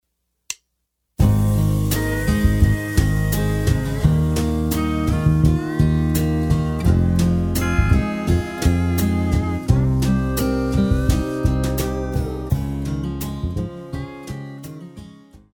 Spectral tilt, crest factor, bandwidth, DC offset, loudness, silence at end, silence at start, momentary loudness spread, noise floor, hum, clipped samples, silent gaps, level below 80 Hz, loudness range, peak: -6.5 dB/octave; 16 dB; 19.5 kHz; under 0.1%; -20 LUFS; 0.2 s; 0.5 s; 13 LU; -74 dBFS; none; under 0.1%; none; -26 dBFS; 5 LU; -2 dBFS